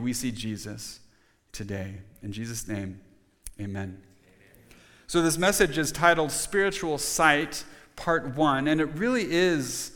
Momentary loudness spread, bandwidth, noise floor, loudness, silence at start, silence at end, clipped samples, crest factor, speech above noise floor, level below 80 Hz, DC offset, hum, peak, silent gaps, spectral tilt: 18 LU; 19 kHz; -57 dBFS; -26 LUFS; 0 s; 0 s; under 0.1%; 22 dB; 31 dB; -50 dBFS; under 0.1%; none; -4 dBFS; none; -4 dB/octave